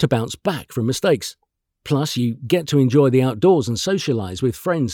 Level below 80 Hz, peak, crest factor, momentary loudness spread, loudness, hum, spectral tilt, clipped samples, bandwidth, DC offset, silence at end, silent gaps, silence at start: -54 dBFS; -4 dBFS; 16 dB; 8 LU; -19 LUFS; none; -6 dB/octave; under 0.1%; 18 kHz; under 0.1%; 0 s; none; 0 s